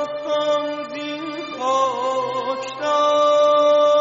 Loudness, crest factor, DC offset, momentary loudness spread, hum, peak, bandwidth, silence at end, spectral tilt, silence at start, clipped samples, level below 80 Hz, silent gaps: -20 LUFS; 12 dB; under 0.1%; 13 LU; none; -6 dBFS; 7.8 kHz; 0 s; -1 dB/octave; 0 s; under 0.1%; -68 dBFS; none